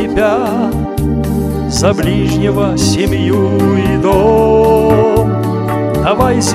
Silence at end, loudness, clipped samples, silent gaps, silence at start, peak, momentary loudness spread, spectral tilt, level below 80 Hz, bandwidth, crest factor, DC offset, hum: 0 s; -12 LUFS; 0.1%; none; 0 s; 0 dBFS; 6 LU; -6 dB/octave; -26 dBFS; 15.5 kHz; 12 dB; under 0.1%; none